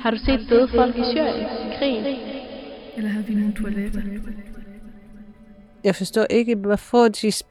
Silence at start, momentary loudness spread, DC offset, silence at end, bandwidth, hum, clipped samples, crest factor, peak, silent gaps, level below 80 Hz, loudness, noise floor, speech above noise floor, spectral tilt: 0 s; 17 LU; under 0.1%; 0.1 s; 14 kHz; none; under 0.1%; 18 dB; -4 dBFS; none; -38 dBFS; -21 LUFS; -47 dBFS; 26 dB; -5.5 dB/octave